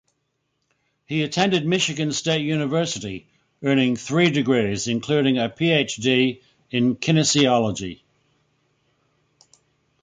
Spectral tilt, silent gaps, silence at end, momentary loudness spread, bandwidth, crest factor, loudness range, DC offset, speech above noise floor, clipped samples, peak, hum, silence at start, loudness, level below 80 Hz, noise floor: -4.5 dB/octave; none; 2.1 s; 10 LU; 9.6 kHz; 18 dB; 3 LU; under 0.1%; 53 dB; under 0.1%; -4 dBFS; none; 1.1 s; -21 LUFS; -58 dBFS; -74 dBFS